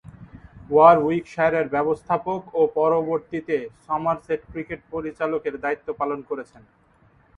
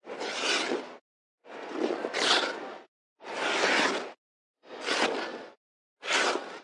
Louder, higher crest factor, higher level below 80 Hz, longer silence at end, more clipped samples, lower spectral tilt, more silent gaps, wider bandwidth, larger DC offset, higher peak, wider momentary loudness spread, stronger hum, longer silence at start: first, -23 LUFS vs -28 LUFS; about the same, 22 dB vs 20 dB; first, -56 dBFS vs under -90 dBFS; first, 0.95 s vs 0 s; neither; first, -8 dB/octave vs -1 dB/octave; second, none vs 1.01-1.38 s, 2.88-3.16 s, 4.18-4.54 s, 5.57-5.97 s; second, 7.2 kHz vs 11.5 kHz; neither; first, -2 dBFS vs -10 dBFS; second, 16 LU vs 20 LU; neither; first, 0.2 s vs 0.05 s